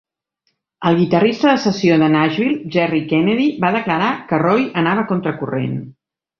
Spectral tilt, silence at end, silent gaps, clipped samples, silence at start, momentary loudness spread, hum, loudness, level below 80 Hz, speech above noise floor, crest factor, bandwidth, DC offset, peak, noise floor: -7 dB/octave; 0.5 s; none; under 0.1%; 0.8 s; 8 LU; none; -16 LUFS; -56 dBFS; 54 dB; 16 dB; 6.8 kHz; under 0.1%; -2 dBFS; -70 dBFS